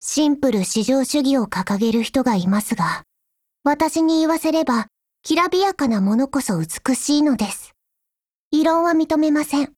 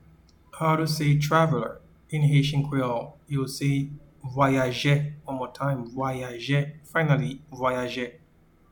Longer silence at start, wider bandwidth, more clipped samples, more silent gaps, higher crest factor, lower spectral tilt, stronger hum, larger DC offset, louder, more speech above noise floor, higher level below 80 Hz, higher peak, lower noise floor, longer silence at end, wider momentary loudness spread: second, 0 s vs 0.55 s; second, 16.5 kHz vs 19 kHz; neither; first, 8.29-8.51 s vs none; about the same, 14 dB vs 18 dB; second, -4.5 dB/octave vs -6.5 dB/octave; neither; neither; first, -19 LUFS vs -26 LUFS; first, 64 dB vs 33 dB; about the same, -54 dBFS vs -54 dBFS; first, -4 dBFS vs -8 dBFS; first, -83 dBFS vs -58 dBFS; second, 0.1 s vs 0.6 s; second, 6 LU vs 12 LU